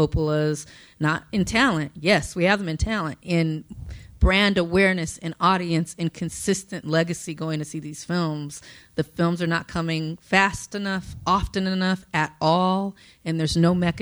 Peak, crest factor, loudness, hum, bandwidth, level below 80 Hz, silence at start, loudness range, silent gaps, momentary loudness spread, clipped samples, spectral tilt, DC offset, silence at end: -4 dBFS; 20 dB; -23 LUFS; none; 19.5 kHz; -38 dBFS; 0 s; 4 LU; none; 12 LU; under 0.1%; -5.5 dB/octave; under 0.1%; 0 s